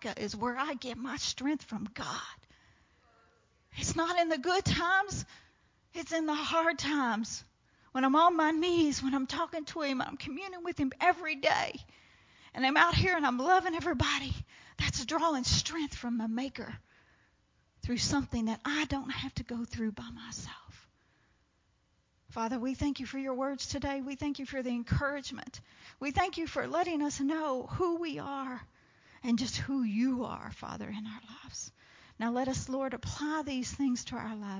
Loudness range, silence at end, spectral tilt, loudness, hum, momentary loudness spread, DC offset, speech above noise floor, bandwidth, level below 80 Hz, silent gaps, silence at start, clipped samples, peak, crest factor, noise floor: 8 LU; 0 s; -4 dB/octave; -32 LUFS; none; 15 LU; under 0.1%; 40 dB; 7.6 kHz; -52 dBFS; none; 0 s; under 0.1%; -10 dBFS; 24 dB; -73 dBFS